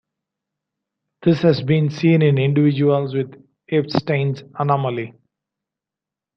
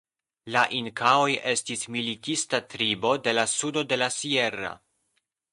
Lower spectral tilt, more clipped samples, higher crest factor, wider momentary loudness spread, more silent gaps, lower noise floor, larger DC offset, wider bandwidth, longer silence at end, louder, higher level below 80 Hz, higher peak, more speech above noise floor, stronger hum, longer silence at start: first, -8.5 dB/octave vs -2.5 dB/octave; neither; about the same, 18 dB vs 20 dB; about the same, 9 LU vs 7 LU; neither; first, -87 dBFS vs -76 dBFS; neither; second, 6.2 kHz vs 11.5 kHz; first, 1.25 s vs 0.75 s; first, -19 LUFS vs -25 LUFS; first, -60 dBFS vs -68 dBFS; first, -2 dBFS vs -6 dBFS; first, 70 dB vs 49 dB; neither; first, 1.2 s vs 0.45 s